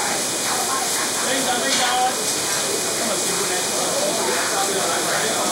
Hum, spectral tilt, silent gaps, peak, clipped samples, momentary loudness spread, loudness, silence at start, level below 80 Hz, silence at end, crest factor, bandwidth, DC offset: none; -1 dB/octave; none; -6 dBFS; under 0.1%; 2 LU; -19 LUFS; 0 s; -62 dBFS; 0 s; 16 dB; 16 kHz; under 0.1%